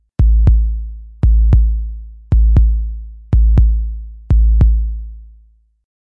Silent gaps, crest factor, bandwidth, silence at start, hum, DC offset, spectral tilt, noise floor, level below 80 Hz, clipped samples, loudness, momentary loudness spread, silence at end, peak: none; 12 dB; 2 kHz; 0.2 s; none; under 0.1%; -11 dB/octave; -49 dBFS; -14 dBFS; under 0.1%; -15 LUFS; 17 LU; 0.75 s; 0 dBFS